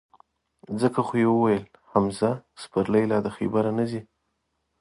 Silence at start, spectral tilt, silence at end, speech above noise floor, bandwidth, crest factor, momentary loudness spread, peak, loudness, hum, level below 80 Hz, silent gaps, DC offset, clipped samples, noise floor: 0.7 s; -7.5 dB/octave; 0.8 s; 52 dB; 11.5 kHz; 20 dB; 8 LU; -6 dBFS; -25 LUFS; none; -58 dBFS; none; under 0.1%; under 0.1%; -76 dBFS